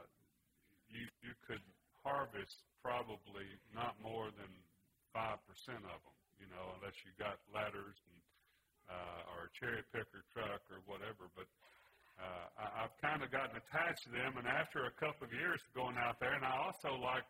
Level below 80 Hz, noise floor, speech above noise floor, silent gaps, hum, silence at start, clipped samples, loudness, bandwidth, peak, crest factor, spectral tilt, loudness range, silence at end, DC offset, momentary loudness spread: -74 dBFS; -78 dBFS; 33 dB; none; none; 0 s; under 0.1%; -44 LUFS; 16 kHz; -22 dBFS; 24 dB; -5 dB/octave; 9 LU; 0 s; under 0.1%; 15 LU